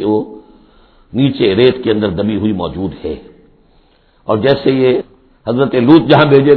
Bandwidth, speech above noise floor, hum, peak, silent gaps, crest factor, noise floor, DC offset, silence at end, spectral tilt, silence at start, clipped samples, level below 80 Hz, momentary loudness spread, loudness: 5.4 kHz; 39 dB; none; 0 dBFS; none; 12 dB; -50 dBFS; under 0.1%; 0 s; -10 dB/octave; 0 s; 0.3%; -42 dBFS; 17 LU; -12 LUFS